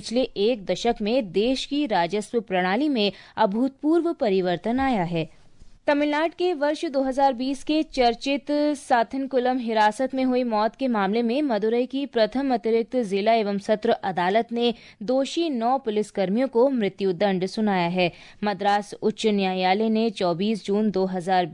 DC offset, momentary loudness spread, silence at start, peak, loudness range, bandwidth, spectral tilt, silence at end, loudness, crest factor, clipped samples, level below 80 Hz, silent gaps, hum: under 0.1%; 4 LU; 0 s; -8 dBFS; 1 LU; 11 kHz; -5.5 dB/octave; 0 s; -24 LUFS; 14 dB; under 0.1%; -54 dBFS; none; none